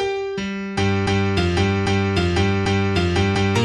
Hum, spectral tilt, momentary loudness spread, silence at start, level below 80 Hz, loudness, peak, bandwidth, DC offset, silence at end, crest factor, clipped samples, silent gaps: none; -6 dB/octave; 6 LU; 0 s; -38 dBFS; -20 LUFS; -6 dBFS; 10.5 kHz; under 0.1%; 0 s; 14 dB; under 0.1%; none